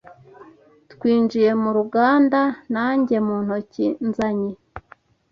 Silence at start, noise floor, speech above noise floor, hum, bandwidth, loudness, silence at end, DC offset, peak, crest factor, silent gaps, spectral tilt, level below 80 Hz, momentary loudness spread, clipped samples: 0.1 s; -52 dBFS; 33 dB; none; 7 kHz; -20 LUFS; 0.5 s; under 0.1%; -4 dBFS; 16 dB; none; -7.5 dB/octave; -58 dBFS; 10 LU; under 0.1%